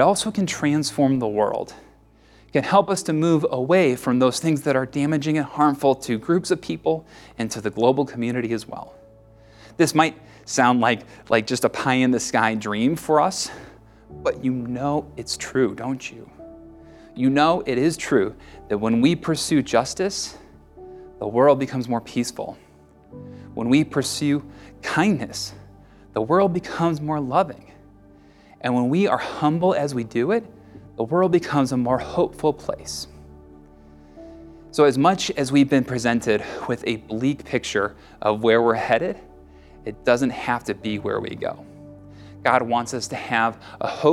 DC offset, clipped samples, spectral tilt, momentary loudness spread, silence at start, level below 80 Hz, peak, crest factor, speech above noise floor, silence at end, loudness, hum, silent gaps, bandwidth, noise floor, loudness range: under 0.1%; under 0.1%; -5 dB/octave; 12 LU; 0 s; -52 dBFS; -2 dBFS; 20 dB; 31 dB; 0 s; -22 LUFS; none; none; 15.5 kHz; -53 dBFS; 4 LU